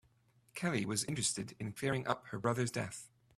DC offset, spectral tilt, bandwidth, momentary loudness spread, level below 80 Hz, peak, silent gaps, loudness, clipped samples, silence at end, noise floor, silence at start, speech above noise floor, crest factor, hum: under 0.1%; -4 dB/octave; 14.5 kHz; 9 LU; -70 dBFS; -16 dBFS; none; -37 LUFS; under 0.1%; 0.3 s; -71 dBFS; 0.55 s; 33 dB; 22 dB; none